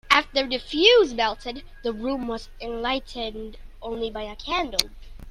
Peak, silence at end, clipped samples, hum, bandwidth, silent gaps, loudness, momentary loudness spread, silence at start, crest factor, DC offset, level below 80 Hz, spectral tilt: 0 dBFS; 0 s; under 0.1%; none; 16 kHz; none; -24 LUFS; 18 LU; 0.05 s; 24 dB; under 0.1%; -42 dBFS; -2.5 dB/octave